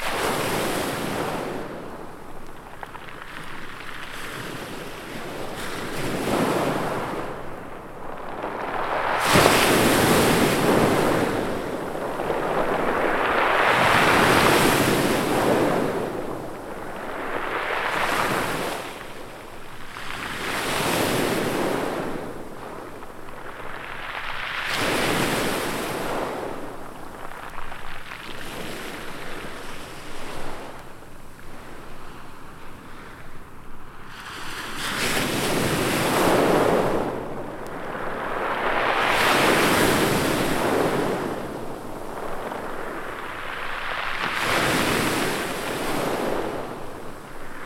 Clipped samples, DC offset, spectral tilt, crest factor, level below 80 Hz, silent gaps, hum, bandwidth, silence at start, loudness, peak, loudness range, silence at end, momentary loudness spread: under 0.1%; under 0.1%; -4 dB/octave; 24 dB; -42 dBFS; none; none; 16.5 kHz; 0 s; -23 LUFS; 0 dBFS; 16 LU; 0 s; 21 LU